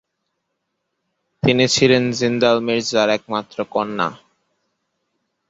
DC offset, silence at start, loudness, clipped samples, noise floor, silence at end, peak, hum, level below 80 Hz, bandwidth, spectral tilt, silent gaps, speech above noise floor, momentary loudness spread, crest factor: under 0.1%; 1.45 s; -18 LUFS; under 0.1%; -75 dBFS; 1.35 s; 0 dBFS; none; -56 dBFS; 8 kHz; -4.5 dB/octave; none; 57 dB; 10 LU; 20 dB